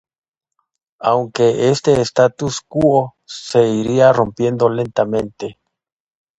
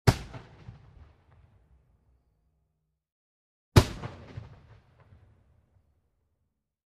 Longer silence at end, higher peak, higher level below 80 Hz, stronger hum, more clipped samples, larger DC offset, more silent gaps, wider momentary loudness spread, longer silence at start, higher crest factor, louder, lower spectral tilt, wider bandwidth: second, 0.85 s vs 2.8 s; about the same, 0 dBFS vs -2 dBFS; second, -50 dBFS vs -44 dBFS; neither; neither; neither; second, none vs 3.12-3.72 s; second, 12 LU vs 27 LU; first, 1 s vs 0.05 s; second, 16 dB vs 32 dB; first, -16 LUFS vs -27 LUFS; about the same, -6 dB/octave vs -6 dB/octave; second, 9.4 kHz vs 15 kHz